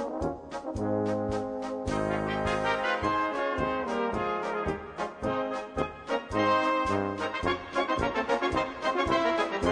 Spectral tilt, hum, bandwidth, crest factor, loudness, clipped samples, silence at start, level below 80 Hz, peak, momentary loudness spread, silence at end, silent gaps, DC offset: -5.5 dB/octave; none; 10.5 kHz; 16 dB; -29 LUFS; under 0.1%; 0 s; -48 dBFS; -14 dBFS; 8 LU; 0 s; none; under 0.1%